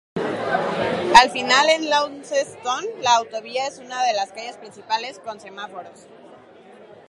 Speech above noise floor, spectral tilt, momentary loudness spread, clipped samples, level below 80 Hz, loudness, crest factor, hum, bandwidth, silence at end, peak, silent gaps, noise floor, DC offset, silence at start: 25 dB; -2 dB/octave; 21 LU; under 0.1%; -58 dBFS; -20 LUFS; 22 dB; none; 11.5 kHz; 0.15 s; 0 dBFS; none; -46 dBFS; under 0.1%; 0.15 s